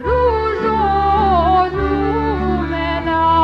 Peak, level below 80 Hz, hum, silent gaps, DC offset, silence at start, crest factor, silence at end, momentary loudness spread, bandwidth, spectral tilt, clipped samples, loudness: -4 dBFS; -26 dBFS; none; none; under 0.1%; 0 s; 12 dB; 0 s; 5 LU; 6.4 kHz; -8 dB/octave; under 0.1%; -16 LUFS